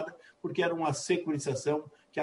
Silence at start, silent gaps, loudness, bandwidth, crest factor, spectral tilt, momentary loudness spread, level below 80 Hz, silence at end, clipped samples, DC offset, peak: 0 s; none; -32 LUFS; 11.5 kHz; 16 dB; -5 dB/octave; 11 LU; -76 dBFS; 0 s; under 0.1%; under 0.1%; -16 dBFS